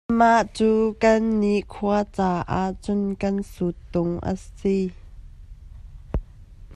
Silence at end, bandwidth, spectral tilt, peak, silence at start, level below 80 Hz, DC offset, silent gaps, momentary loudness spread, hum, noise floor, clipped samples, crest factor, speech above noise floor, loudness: 0 s; 11.5 kHz; -7 dB/octave; -4 dBFS; 0.1 s; -40 dBFS; under 0.1%; none; 11 LU; none; -44 dBFS; under 0.1%; 18 dB; 22 dB; -23 LUFS